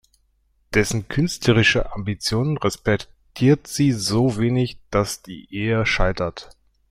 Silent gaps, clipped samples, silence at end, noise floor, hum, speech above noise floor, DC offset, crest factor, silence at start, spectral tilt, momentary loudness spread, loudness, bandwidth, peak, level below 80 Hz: none; under 0.1%; 0.4 s; -64 dBFS; none; 44 dB; under 0.1%; 18 dB; 0.7 s; -5 dB/octave; 9 LU; -21 LUFS; 16 kHz; -4 dBFS; -36 dBFS